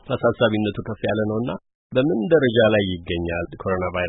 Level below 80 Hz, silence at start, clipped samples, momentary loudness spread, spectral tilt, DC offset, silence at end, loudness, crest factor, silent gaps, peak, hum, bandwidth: -48 dBFS; 0.05 s; under 0.1%; 10 LU; -11.5 dB/octave; under 0.1%; 0 s; -21 LUFS; 16 dB; 1.75-1.90 s; -6 dBFS; none; 4 kHz